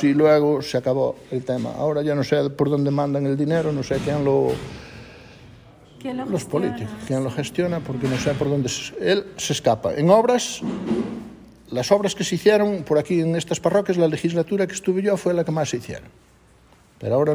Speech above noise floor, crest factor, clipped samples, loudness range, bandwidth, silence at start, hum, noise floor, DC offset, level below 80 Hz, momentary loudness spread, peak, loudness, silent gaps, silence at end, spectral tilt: 32 dB; 18 dB; under 0.1%; 5 LU; 16 kHz; 0 s; none; -53 dBFS; under 0.1%; -52 dBFS; 12 LU; -2 dBFS; -22 LUFS; none; 0 s; -5.5 dB/octave